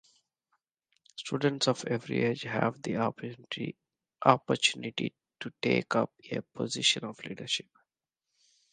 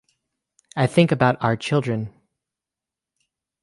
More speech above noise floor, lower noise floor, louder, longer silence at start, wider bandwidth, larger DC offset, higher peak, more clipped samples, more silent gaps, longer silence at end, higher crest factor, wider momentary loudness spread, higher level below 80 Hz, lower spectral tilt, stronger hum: second, 58 dB vs 68 dB; about the same, -88 dBFS vs -88 dBFS; second, -30 LUFS vs -21 LUFS; first, 1.15 s vs 0.75 s; second, 9.8 kHz vs 11.5 kHz; neither; about the same, -4 dBFS vs -2 dBFS; neither; neither; second, 1.1 s vs 1.55 s; first, 28 dB vs 20 dB; about the same, 14 LU vs 13 LU; second, -74 dBFS vs -58 dBFS; second, -4 dB/octave vs -7 dB/octave; neither